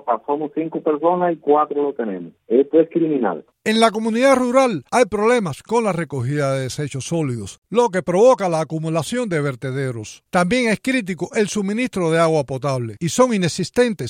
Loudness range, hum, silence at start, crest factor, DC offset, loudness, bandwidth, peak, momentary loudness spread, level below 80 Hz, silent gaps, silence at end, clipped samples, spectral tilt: 3 LU; none; 0.05 s; 16 dB; under 0.1%; -19 LUFS; 16 kHz; -2 dBFS; 9 LU; -56 dBFS; 7.58-7.62 s; 0 s; under 0.1%; -5.5 dB/octave